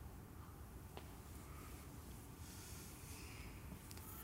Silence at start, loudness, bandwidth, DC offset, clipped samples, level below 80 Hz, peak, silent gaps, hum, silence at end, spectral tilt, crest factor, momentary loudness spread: 0 s; -55 LUFS; 16 kHz; under 0.1%; under 0.1%; -60 dBFS; -34 dBFS; none; none; 0 s; -4.5 dB/octave; 20 dB; 3 LU